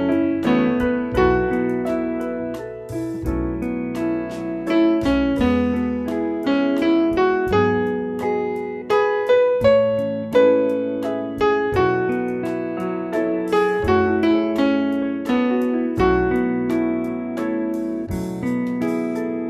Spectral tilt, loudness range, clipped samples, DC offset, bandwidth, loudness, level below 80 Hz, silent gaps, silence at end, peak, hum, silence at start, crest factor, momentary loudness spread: -7.5 dB/octave; 4 LU; under 0.1%; under 0.1%; 14 kHz; -20 LUFS; -40 dBFS; none; 0 s; -4 dBFS; none; 0 s; 16 dB; 8 LU